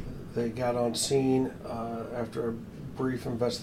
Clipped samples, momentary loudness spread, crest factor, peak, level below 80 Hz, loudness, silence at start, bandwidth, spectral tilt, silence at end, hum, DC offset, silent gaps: under 0.1%; 10 LU; 16 dB; -16 dBFS; -52 dBFS; -31 LUFS; 0 s; 16 kHz; -5 dB/octave; 0 s; none; under 0.1%; none